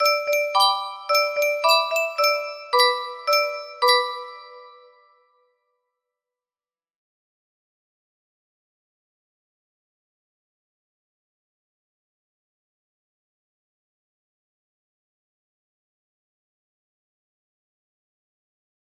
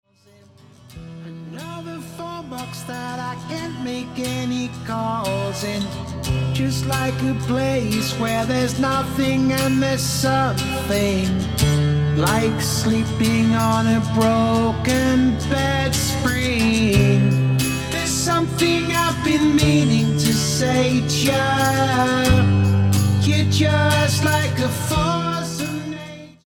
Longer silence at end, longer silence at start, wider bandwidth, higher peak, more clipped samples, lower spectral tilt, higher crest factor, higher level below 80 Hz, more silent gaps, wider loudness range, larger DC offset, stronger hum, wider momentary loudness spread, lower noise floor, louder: first, 14.3 s vs 0.15 s; second, 0 s vs 0.9 s; second, 15.5 kHz vs 19.5 kHz; about the same, -6 dBFS vs -4 dBFS; neither; second, 3 dB/octave vs -5 dB/octave; first, 22 dB vs 16 dB; second, -82 dBFS vs -36 dBFS; neither; about the same, 7 LU vs 9 LU; neither; neither; second, 9 LU vs 12 LU; first, under -90 dBFS vs -51 dBFS; about the same, -20 LUFS vs -19 LUFS